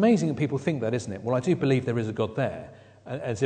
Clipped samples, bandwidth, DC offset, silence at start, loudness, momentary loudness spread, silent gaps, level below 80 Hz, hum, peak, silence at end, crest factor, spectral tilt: under 0.1%; 9.4 kHz; under 0.1%; 0 s; -27 LUFS; 11 LU; none; -62 dBFS; none; -10 dBFS; 0 s; 16 dB; -7 dB/octave